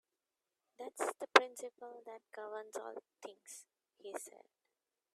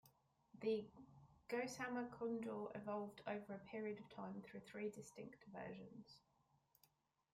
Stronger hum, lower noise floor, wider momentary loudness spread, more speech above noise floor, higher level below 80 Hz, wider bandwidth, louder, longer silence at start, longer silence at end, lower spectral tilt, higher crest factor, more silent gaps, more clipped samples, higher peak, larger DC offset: neither; first, under -90 dBFS vs -80 dBFS; first, 24 LU vs 16 LU; first, over 50 dB vs 31 dB; about the same, -88 dBFS vs -84 dBFS; about the same, 15 kHz vs 16 kHz; first, -36 LUFS vs -49 LUFS; first, 0.8 s vs 0.05 s; second, 0.85 s vs 1.15 s; second, -0.5 dB/octave vs -5.5 dB/octave; first, 34 dB vs 18 dB; neither; neither; first, -8 dBFS vs -32 dBFS; neither